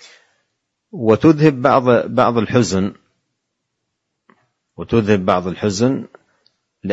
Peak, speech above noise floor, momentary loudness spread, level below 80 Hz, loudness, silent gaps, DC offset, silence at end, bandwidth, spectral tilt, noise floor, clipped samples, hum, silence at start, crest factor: 0 dBFS; 60 dB; 13 LU; -52 dBFS; -16 LUFS; none; under 0.1%; 0 s; 8 kHz; -6.5 dB/octave; -75 dBFS; under 0.1%; none; 0.95 s; 18 dB